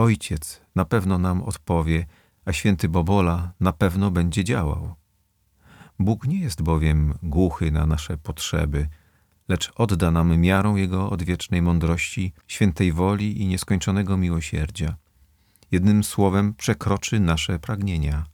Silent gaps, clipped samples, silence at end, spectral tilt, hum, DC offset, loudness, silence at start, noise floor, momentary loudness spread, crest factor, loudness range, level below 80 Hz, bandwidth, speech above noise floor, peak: none; under 0.1%; 0.05 s; -6 dB/octave; none; under 0.1%; -23 LUFS; 0 s; -66 dBFS; 8 LU; 16 dB; 3 LU; -34 dBFS; 18 kHz; 45 dB; -6 dBFS